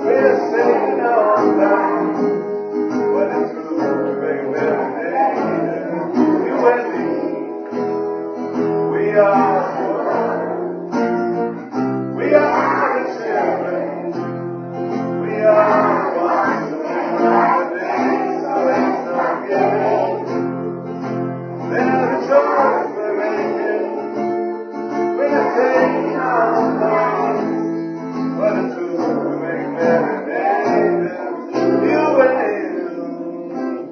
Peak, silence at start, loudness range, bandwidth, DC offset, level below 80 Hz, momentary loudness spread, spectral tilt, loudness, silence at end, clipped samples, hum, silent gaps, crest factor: 0 dBFS; 0 s; 3 LU; 6.6 kHz; under 0.1%; -72 dBFS; 10 LU; -7.5 dB/octave; -18 LUFS; 0 s; under 0.1%; none; none; 18 dB